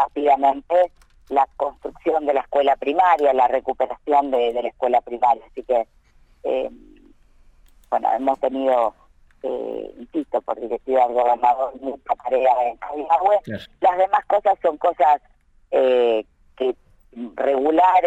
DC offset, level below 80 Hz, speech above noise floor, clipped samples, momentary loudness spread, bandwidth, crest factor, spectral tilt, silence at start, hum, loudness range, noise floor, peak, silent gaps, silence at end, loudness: under 0.1%; -54 dBFS; 32 dB; under 0.1%; 11 LU; 8.8 kHz; 16 dB; -6 dB/octave; 0 s; none; 5 LU; -52 dBFS; -6 dBFS; none; 0 s; -20 LUFS